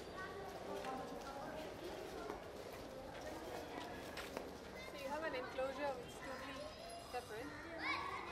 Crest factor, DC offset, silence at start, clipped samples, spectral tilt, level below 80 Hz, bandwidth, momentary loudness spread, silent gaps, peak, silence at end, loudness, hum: 20 dB; under 0.1%; 0 s; under 0.1%; -4 dB/octave; -66 dBFS; 16 kHz; 8 LU; none; -26 dBFS; 0 s; -47 LUFS; none